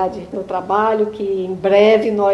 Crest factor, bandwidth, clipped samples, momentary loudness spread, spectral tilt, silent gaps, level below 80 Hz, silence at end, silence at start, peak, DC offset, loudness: 16 dB; 7.6 kHz; under 0.1%; 12 LU; -6.5 dB/octave; none; -52 dBFS; 0 s; 0 s; 0 dBFS; under 0.1%; -16 LUFS